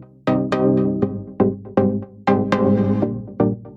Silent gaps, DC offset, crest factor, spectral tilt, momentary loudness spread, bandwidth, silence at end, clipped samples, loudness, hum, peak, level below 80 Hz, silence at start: none; under 0.1%; 16 dB; -9 dB/octave; 6 LU; 7.2 kHz; 0 s; under 0.1%; -20 LUFS; none; -4 dBFS; -48 dBFS; 0 s